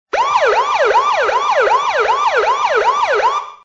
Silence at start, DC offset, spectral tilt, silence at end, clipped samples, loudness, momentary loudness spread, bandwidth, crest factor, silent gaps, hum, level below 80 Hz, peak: 0.15 s; under 0.1%; -1 dB/octave; 0.1 s; under 0.1%; -14 LUFS; 2 LU; 8 kHz; 12 dB; none; none; -52 dBFS; -2 dBFS